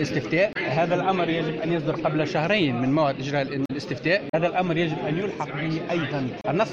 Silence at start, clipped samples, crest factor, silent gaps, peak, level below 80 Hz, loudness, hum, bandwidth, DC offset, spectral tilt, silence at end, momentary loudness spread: 0 s; under 0.1%; 16 dB; 4.29-4.33 s; -8 dBFS; -56 dBFS; -24 LUFS; none; 7.8 kHz; under 0.1%; -6.5 dB/octave; 0 s; 6 LU